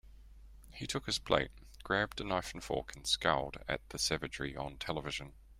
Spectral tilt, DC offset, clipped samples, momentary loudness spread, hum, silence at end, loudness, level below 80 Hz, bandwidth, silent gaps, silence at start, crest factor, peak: -3 dB/octave; under 0.1%; under 0.1%; 10 LU; none; 0 s; -36 LUFS; -54 dBFS; 16 kHz; none; 0.05 s; 24 dB; -14 dBFS